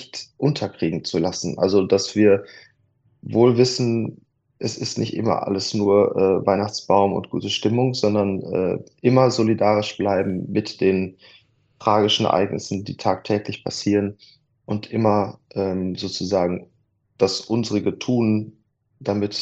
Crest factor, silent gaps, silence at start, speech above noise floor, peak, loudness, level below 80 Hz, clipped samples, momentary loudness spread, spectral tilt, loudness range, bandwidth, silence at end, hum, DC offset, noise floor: 20 dB; none; 0 s; 43 dB; -2 dBFS; -21 LUFS; -60 dBFS; under 0.1%; 9 LU; -5.5 dB/octave; 4 LU; 8.4 kHz; 0 s; none; under 0.1%; -63 dBFS